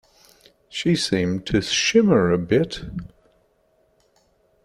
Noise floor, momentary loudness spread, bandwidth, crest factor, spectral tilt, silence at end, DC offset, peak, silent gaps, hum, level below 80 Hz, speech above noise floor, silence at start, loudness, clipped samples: -63 dBFS; 16 LU; 12.5 kHz; 20 dB; -4.5 dB/octave; 1.6 s; under 0.1%; -4 dBFS; none; none; -48 dBFS; 43 dB; 0.75 s; -20 LUFS; under 0.1%